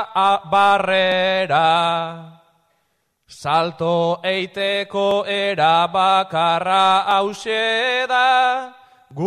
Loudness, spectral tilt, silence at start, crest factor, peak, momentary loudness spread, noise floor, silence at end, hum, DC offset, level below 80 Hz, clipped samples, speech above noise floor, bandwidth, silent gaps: -17 LUFS; -4 dB/octave; 0 s; 14 dB; -4 dBFS; 7 LU; -68 dBFS; 0 s; none; under 0.1%; -64 dBFS; under 0.1%; 51 dB; 11 kHz; none